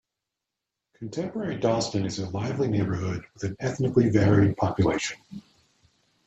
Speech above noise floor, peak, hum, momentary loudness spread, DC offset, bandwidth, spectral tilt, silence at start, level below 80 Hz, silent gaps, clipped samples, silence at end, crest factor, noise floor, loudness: 61 dB; -6 dBFS; none; 15 LU; under 0.1%; 8.2 kHz; -6.5 dB/octave; 1 s; -54 dBFS; none; under 0.1%; 0.85 s; 20 dB; -86 dBFS; -26 LUFS